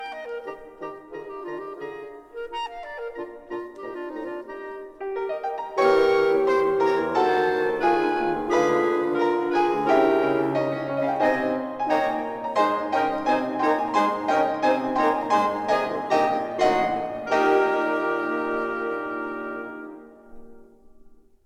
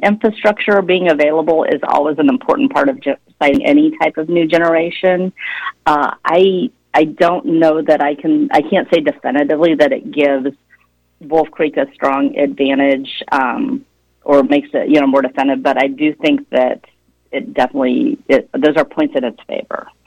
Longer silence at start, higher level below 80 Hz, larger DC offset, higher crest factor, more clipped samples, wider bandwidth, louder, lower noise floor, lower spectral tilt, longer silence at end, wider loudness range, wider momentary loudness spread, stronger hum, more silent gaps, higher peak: about the same, 0 s vs 0 s; about the same, -58 dBFS vs -54 dBFS; neither; about the same, 16 dB vs 12 dB; neither; first, 13.5 kHz vs 8.8 kHz; second, -23 LUFS vs -14 LUFS; second, -50 dBFS vs -54 dBFS; about the same, -5.5 dB/octave vs -6.5 dB/octave; about the same, 0.3 s vs 0.25 s; first, 13 LU vs 3 LU; first, 15 LU vs 8 LU; neither; neither; second, -8 dBFS vs -2 dBFS